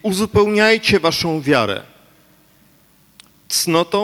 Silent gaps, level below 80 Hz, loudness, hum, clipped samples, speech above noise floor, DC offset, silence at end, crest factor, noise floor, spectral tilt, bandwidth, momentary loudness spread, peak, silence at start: none; -46 dBFS; -16 LUFS; 50 Hz at -55 dBFS; under 0.1%; 37 dB; under 0.1%; 0 s; 16 dB; -53 dBFS; -4 dB/octave; 17.5 kHz; 7 LU; -2 dBFS; 0.05 s